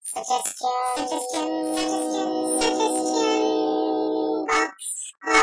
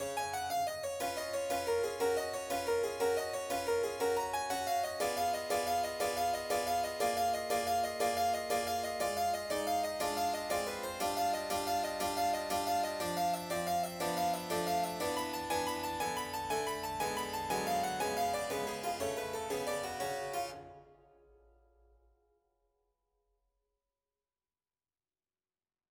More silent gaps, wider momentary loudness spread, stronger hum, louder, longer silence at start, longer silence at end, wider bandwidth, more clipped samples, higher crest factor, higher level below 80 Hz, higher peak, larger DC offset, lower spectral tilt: neither; about the same, 5 LU vs 4 LU; neither; first, -24 LUFS vs -35 LUFS; about the same, 0.05 s vs 0 s; second, 0 s vs 5 s; second, 11 kHz vs over 20 kHz; neither; about the same, 20 dB vs 16 dB; first, -60 dBFS vs -66 dBFS; first, -4 dBFS vs -20 dBFS; neither; second, -1.5 dB/octave vs -3 dB/octave